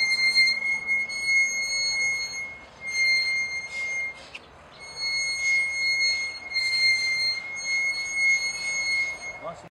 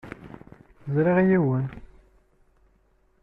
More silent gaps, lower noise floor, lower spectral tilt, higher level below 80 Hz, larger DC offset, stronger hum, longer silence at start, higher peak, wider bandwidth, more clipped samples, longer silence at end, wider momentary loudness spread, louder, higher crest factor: neither; second, -46 dBFS vs -63 dBFS; second, 1.5 dB/octave vs -11 dB/octave; second, -62 dBFS vs -54 dBFS; neither; neither; about the same, 0 s vs 0.05 s; about the same, -10 dBFS vs -8 dBFS; first, 13.5 kHz vs 3.8 kHz; neither; second, 0 s vs 1.4 s; second, 14 LU vs 24 LU; about the same, -23 LUFS vs -23 LUFS; about the same, 16 dB vs 18 dB